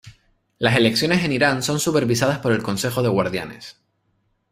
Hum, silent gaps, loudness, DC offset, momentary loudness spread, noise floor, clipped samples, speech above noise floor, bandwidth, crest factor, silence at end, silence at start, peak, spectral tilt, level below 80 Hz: none; none; -20 LUFS; under 0.1%; 11 LU; -68 dBFS; under 0.1%; 48 dB; 16 kHz; 20 dB; 0.8 s; 0.05 s; 0 dBFS; -4.5 dB/octave; -54 dBFS